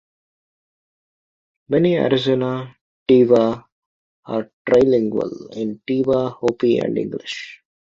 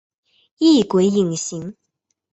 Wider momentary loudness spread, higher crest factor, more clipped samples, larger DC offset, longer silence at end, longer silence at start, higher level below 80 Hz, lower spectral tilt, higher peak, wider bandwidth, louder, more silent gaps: about the same, 14 LU vs 16 LU; about the same, 18 dB vs 16 dB; neither; neither; second, 0.4 s vs 0.6 s; first, 1.7 s vs 0.6 s; about the same, -58 dBFS vs -60 dBFS; first, -7 dB/octave vs -5.5 dB/octave; about the same, -2 dBFS vs -4 dBFS; about the same, 7.6 kHz vs 8.2 kHz; about the same, -19 LUFS vs -17 LUFS; first, 2.81-3.06 s, 3.72-4.23 s, 4.53-4.65 s vs none